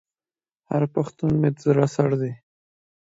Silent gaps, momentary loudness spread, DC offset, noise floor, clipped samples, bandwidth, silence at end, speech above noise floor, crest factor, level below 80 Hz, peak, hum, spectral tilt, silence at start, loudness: none; 8 LU; under 0.1%; under -90 dBFS; under 0.1%; 8 kHz; 0.8 s; over 69 dB; 20 dB; -56 dBFS; -4 dBFS; none; -8.5 dB/octave; 0.7 s; -23 LUFS